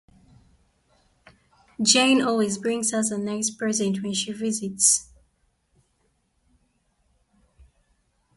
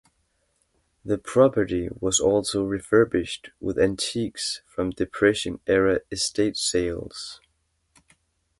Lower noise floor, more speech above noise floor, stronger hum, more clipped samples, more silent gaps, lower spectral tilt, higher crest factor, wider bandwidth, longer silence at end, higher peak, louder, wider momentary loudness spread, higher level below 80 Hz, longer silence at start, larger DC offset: about the same, -69 dBFS vs -71 dBFS; about the same, 46 dB vs 48 dB; neither; neither; neither; second, -2.5 dB/octave vs -4 dB/octave; about the same, 24 dB vs 20 dB; about the same, 12 kHz vs 11.5 kHz; first, 3.35 s vs 1.25 s; about the same, -2 dBFS vs -4 dBFS; about the same, -22 LUFS vs -24 LUFS; about the same, 9 LU vs 11 LU; second, -64 dBFS vs -48 dBFS; first, 1.8 s vs 1.05 s; neither